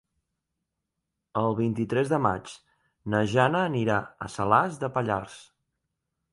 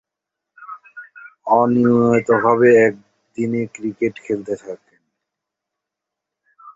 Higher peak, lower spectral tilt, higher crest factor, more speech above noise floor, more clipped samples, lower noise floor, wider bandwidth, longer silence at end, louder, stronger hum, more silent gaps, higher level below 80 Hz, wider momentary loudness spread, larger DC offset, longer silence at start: second, -6 dBFS vs -2 dBFS; second, -6.5 dB/octave vs -8 dB/octave; about the same, 22 dB vs 18 dB; second, 58 dB vs 67 dB; neither; about the same, -83 dBFS vs -83 dBFS; first, 11.5 kHz vs 7.8 kHz; first, 0.9 s vs 0.05 s; second, -26 LUFS vs -17 LUFS; neither; neither; about the same, -58 dBFS vs -60 dBFS; second, 12 LU vs 24 LU; neither; first, 1.35 s vs 0.6 s